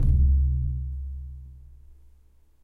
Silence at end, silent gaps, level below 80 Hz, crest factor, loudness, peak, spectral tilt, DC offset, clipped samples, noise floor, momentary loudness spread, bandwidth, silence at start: 0.7 s; none; -26 dBFS; 14 dB; -26 LUFS; -10 dBFS; -11.5 dB/octave; under 0.1%; under 0.1%; -56 dBFS; 22 LU; 0.7 kHz; 0 s